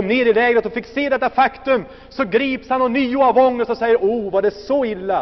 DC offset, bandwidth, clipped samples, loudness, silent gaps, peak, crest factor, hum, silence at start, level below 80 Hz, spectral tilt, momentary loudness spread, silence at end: under 0.1%; 6.2 kHz; under 0.1%; -18 LUFS; none; -4 dBFS; 12 dB; none; 0 s; -48 dBFS; -3 dB/octave; 6 LU; 0 s